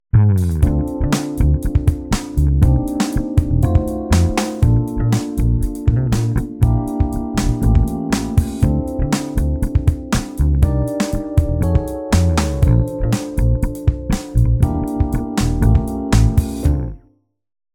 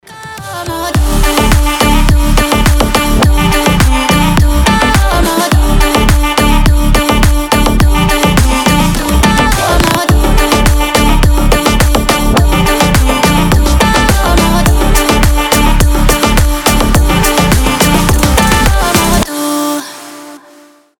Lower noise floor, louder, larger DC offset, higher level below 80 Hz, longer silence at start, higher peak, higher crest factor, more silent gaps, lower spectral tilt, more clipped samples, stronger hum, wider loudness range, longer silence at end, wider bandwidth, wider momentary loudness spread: first, -56 dBFS vs -41 dBFS; second, -18 LUFS vs -9 LUFS; neither; second, -20 dBFS vs -12 dBFS; about the same, 0.15 s vs 0.1 s; about the same, -2 dBFS vs 0 dBFS; first, 14 dB vs 8 dB; neither; first, -7 dB/octave vs -4.5 dB/octave; neither; neither; about the same, 2 LU vs 1 LU; about the same, 0.75 s vs 0.65 s; about the same, 18 kHz vs 19.5 kHz; about the same, 5 LU vs 3 LU